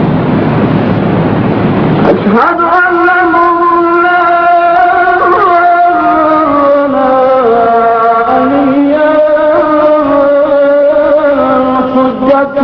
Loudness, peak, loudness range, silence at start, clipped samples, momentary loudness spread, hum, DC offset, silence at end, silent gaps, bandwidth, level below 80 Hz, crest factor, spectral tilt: -8 LUFS; 0 dBFS; 1 LU; 0 s; 0.7%; 3 LU; none; under 0.1%; 0 s; none; 5.4 kHz; -38 dBFS; 8 dB; -9.5 dB/octave